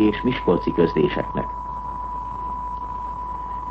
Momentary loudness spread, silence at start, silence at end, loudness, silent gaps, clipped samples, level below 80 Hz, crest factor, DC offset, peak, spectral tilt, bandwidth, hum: 10 LU; 0 s; 0 s; -24 LUFS; none; under 0.1%; -38 dBFS; 18 dB; under 0.1%; -6 dBFS; -8.5 dB/octave; 6.6 kHz; none